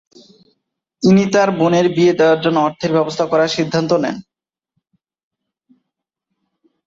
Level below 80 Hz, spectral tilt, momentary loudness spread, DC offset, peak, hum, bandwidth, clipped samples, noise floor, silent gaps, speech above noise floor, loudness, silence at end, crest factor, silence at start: -58 dBFS; -6 dB/octave; 6 LU; under 0.1%; -2 dBFS; none; 7.8 kHz; under 0.1%; -78 dBFS; none; 64 dB; -15 LUFS; 2.65 s; 16 dB; 1 s